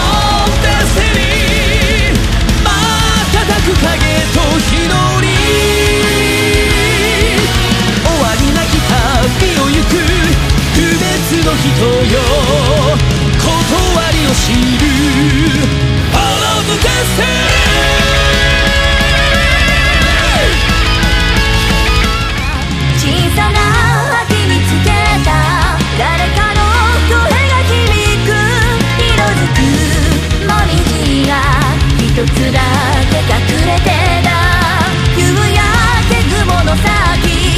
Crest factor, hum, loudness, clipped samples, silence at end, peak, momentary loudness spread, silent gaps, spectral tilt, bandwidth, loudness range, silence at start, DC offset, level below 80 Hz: 10 dB; none; -10 LUFS; under 0.1%; 0 s; 0 dBFS; 2 LU; none; -4.5 dB/octave; 15.5 kHz; 2 LU; 0 s; under 0.1%; -16 dBFS